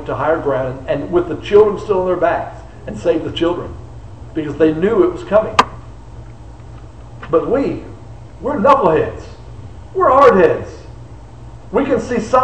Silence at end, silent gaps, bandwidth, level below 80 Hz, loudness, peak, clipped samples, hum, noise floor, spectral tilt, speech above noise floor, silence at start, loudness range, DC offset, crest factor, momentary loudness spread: 0 s; none; 8.8 kHz; -38 dBFS; -15 LUFS; 0 dBFS; under 0.1%; none; -35 dBFS; -6.5 dB/octave; 21 dB; 0 s; 4 LU; 0.8%; 16 dB; 25 LU